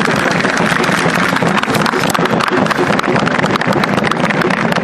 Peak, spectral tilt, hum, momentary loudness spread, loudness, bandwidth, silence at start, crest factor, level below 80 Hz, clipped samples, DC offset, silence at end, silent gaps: 0 dBFS; -5 dB/octave; none; 1 LU; -13 LUFS; 14 kHz; 0 s; 14 dB; -44 dBFS; under 0.1%; under 0.1%; 0 s; none